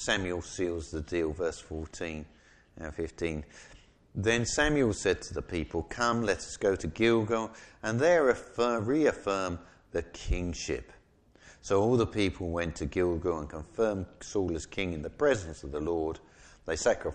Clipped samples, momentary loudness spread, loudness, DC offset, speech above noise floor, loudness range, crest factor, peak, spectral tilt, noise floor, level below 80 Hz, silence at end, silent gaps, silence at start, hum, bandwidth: under 0.1%; 12 LU; -31 LUFS; under 0.1%; 30 dB; 6 LU; 20 dB; -12 dBFS; -5 dB/octave; -61 dBFS; -46 dBFS; 0 s; none; 0 s; none; 10 kHz